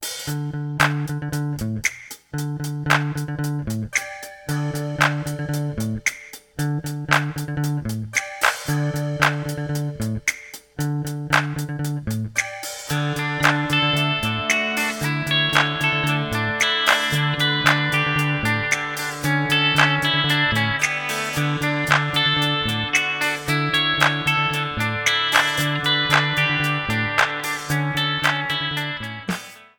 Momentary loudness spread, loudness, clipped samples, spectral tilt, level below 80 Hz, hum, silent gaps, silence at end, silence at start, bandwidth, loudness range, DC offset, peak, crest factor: 10 LU; -21 LUFS; under 0.1%; -3.5 dB/octave; -48 dBFS; none; none; 0.15 s; 0 s; 19.5 kHz; 6 LU; under 0.1%; -2 dBFS; 20 dB